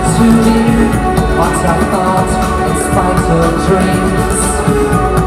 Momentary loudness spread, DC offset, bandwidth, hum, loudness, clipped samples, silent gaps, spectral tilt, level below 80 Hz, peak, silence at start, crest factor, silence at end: 4 LU; under 0.1%; 15.5 kHz; none; -11 LUFS; under 0.1%; none; -5.5 dB/octave; -20 dBFS; 0 dBFS; 0 s; 10 dB; 0 s